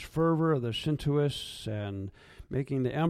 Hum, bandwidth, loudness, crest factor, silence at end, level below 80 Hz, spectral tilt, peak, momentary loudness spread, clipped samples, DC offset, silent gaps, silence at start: none; 14 kHz; -31 LUFS; 16 dB; 0 s; -54 dBFS; -7 dB/octave; -14 dBFS; 10 LU; under 0.1%; under 0.1%; none; 0 s